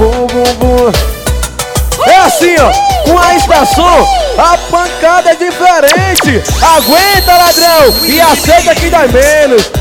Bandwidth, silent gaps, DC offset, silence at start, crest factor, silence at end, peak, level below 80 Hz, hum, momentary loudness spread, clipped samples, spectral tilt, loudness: 19 kHz; none; under 0.1%; 0 s; 6 dB; 0 s; 0 dBFS; -20 dBFS; none; 6 LU; 3%; -3.5 dB/octave; -6 LUFS